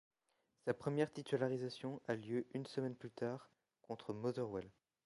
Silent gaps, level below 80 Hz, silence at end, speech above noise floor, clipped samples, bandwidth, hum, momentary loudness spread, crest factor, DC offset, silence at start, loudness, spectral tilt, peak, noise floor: none; -78 dBFS; 0.35 s; 41 dB; under 0.1%; 11.5 kHz; none; 9 LU; 20 dB; under 0.1%; 0.65 s; -43 LUFS; -7 dB/octave; -24 dBFS; -84 dBFS